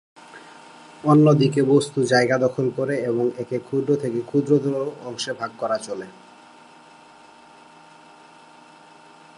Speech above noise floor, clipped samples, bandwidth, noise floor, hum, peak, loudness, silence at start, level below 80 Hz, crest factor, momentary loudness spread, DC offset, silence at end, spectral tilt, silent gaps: 28 dB; under 0.1%; 11 kHz; -48 dBFS; none; -4 dBFS; -21 LUFS; 0.35 s; -70 dBFS; 18 dB; 14 LU; under 0.1%; 3.25 s; -6.5 dB/octave; none